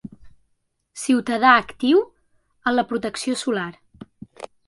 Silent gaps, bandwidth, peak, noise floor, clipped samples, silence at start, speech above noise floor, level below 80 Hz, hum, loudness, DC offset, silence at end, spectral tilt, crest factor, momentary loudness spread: none; 11.5 kHz; -2 dBFS; -70 dBFS; under 0.1%; 0.05 s; 50 dB; -60 dBFS; none; -20 LUFS; under 0.1%; 0.25 s; -3.5 dB/octave; 22 dB; 20 LU